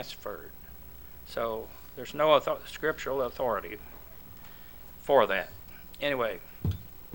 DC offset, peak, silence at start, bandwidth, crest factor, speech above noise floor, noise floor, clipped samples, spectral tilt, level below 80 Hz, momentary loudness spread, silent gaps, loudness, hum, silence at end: 0.3%; -8 dBFS; 0 s; 18 kHz; 22 dB; 19 dB; -49 dBFS; under 0.1%; -5 dB/octave; -52 dBFS; 23 LU; none; -30 LUFS; none; 0 s